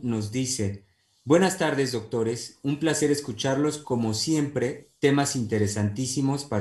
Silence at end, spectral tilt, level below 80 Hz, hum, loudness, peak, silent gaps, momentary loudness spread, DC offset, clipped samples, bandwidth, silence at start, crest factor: 0 s; -5 dB/octave; -60 dBFS; none; -26 LUFS; -8 dBFS; none; 7 LU; under 0.1%; under 0.1%; 13 kHz; 0 s; 18 dB